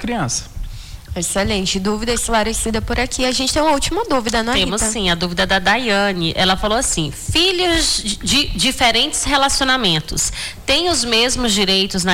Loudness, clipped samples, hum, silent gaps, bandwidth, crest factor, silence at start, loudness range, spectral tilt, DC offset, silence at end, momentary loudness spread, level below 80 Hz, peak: -16 LUFS; under 0.1%; none; none; 19 kHz; 12 dB; 0 s; 3 LU; -2.5 dB/octave; under 0.1%; 0 s; 6 LU; -30 dBFS; -4 dBFS